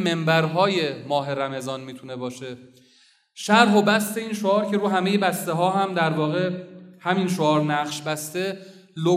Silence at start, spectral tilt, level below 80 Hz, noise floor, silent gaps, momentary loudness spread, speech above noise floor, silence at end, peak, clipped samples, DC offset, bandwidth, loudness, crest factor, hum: 0 s; -5 dB/octave; -76 dBFS; -58 dBFS; none; 15 LU; 36 dB; 0 s; 0 dBFS; under 0.1%; under 0.1%; 15.5 kHz; -22 LUFS; 22 dB; none